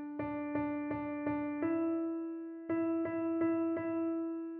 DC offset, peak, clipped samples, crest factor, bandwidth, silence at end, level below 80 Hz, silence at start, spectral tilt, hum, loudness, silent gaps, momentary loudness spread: under 0.1%; -22 dBFS; under 0.1%; 12 dB; 3.2 kHz; 0 s; -70 dBFS; 0 s; -8 dB/octave; none; -36 LUFS; none; 6 LU